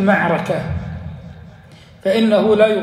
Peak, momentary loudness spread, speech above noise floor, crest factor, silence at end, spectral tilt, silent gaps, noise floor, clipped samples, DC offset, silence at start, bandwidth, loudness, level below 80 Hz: -2 dBFS; 20 LU; 28 dB; 16 dB; 0 s; -7 dB/octave; none; -42 dBFS; under 0.1%; under 0.1%; 0 s; 14 kHz; -17 LUFS; -42 dBFS